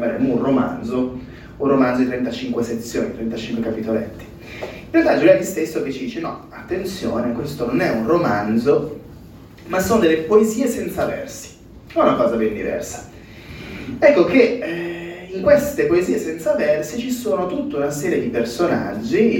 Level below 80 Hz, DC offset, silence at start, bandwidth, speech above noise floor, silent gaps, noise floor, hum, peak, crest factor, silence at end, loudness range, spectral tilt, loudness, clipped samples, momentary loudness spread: -46 dBFS; under 0.1%; 0 s; 18 kHz; 22 dB; none; -40 dBFS; none; 0 dBFS; 18 dB; 0 s; 4 LU; -5.5 dB/octave; -19 LUFS; under 0.1%; 17 LU